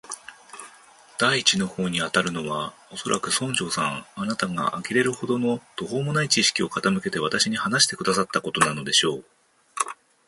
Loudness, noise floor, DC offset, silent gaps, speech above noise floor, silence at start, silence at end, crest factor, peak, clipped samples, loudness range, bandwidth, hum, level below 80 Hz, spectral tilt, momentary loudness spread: -23 LUFS; -51 dBFS; under 0.1%; none; 27 dB; 0.05 s; 0.35 s; 24 dB; -2 dBFS; under 0.1%; 4 LU; 12 kHz; none; -62 dBFS; -3 dB/octave; 14 LU